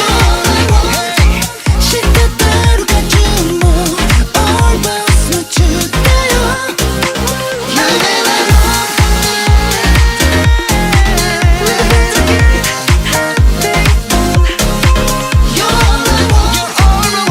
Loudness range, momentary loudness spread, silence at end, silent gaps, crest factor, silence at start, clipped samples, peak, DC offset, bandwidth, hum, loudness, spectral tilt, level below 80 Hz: 1 LU; 3 LU; 0 s; none; 10 dB; 0 s; under 0.1%; 0 dBFS; under 0.1%; 16.5 kHz; none; -10 LUFS; -4 dB/octave; -14 dBFS